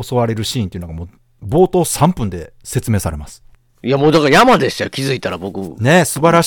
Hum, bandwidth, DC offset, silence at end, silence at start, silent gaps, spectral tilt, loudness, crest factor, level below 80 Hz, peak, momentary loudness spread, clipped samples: none; 19 kHz; under 0.1%; 0 s; 0 s; none; -5 dB/octave; -15 LUFS; 16 dB; -40 dBFS; 0 dBFS; 18 LU; under 0.1%